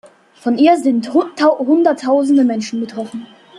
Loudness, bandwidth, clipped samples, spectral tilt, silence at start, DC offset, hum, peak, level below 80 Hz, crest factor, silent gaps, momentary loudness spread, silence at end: -15 LUFS; 11 kHz; under 0.1%; -5 dB/octave; 0.45 s; under 0.1%; none; -2 dBFS; -66 dBFS; 14 dB; none; 12 LU; 0 s